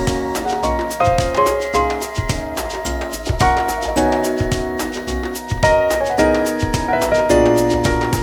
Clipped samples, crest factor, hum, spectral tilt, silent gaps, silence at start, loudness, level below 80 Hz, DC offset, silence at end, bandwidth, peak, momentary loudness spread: under 0.1%; 16 dB; none; -5 dB/octave; none; 0 s; -18 LUFS; -30 dBFS; under 0.1%; 0 s; over 20 kHz; -2 dBFS; 9 LU